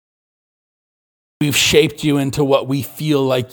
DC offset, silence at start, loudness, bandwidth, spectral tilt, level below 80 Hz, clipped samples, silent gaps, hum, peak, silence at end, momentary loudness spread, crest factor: under 0.1%; 1.4 s; -16 LUFS; 19.5 kHz; -4.5 dB/octave; -46 dBFS; under 0.1%; none; none; 0 dBFS; 0.05 s; 9 LU; 18 dB